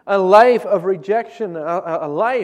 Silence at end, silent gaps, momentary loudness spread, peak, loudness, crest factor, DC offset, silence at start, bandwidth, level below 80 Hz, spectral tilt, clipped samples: 0 s; none; 12 LU; 0 dBFS; -16 LUFS; 16 dB; under 0.1%; 0.05 s; 12 kHz; -62 dBFS; -6 dB/octave; under 0.1%